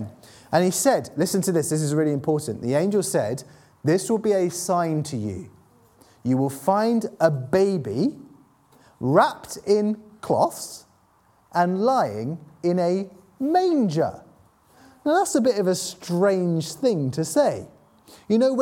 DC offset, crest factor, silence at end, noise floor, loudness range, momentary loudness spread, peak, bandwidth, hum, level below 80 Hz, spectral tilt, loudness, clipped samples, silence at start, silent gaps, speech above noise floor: under 0.1%; 20 dB; 0 s; -60 dBFS; 2 LU; 10 LU; -2 dBFS; 17.5 kHz; none; -64 dBFS; -5.5 dB/octave; -23 LUFS; under 0.1%; 0 s; none; 38 dB